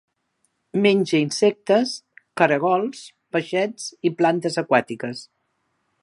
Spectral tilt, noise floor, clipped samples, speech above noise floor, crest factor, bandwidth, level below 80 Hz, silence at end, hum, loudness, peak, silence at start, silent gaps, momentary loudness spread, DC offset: -5 dB/octave; -72 dBFS; under 0.1%; 51 dB; 22 dB; 11.5 kHz; -74 dBFS; 0.8 s; none; -21 LUFS; 0 dBFS; 0.75 s; none; 13 LU; under 0.1%